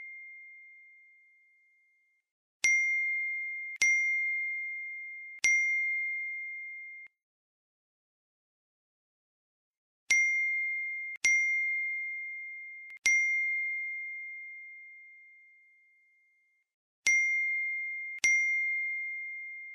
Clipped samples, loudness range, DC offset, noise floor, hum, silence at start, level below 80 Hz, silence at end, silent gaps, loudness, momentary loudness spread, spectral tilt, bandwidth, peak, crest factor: under 0.1%; 8 LU; under 0.1%; -72 dBFS; none; 0 s; -82 dBFS; 0 s; 2.31-2.60 s, 7.23-9.71 s, 9.78-10.07 s, 11.17-11.21 s, 16.74-17.03 s; -29 LUFS; 18 LU; 3.5 dB/octave; 14 kHz; -8 dBFS; 26 dB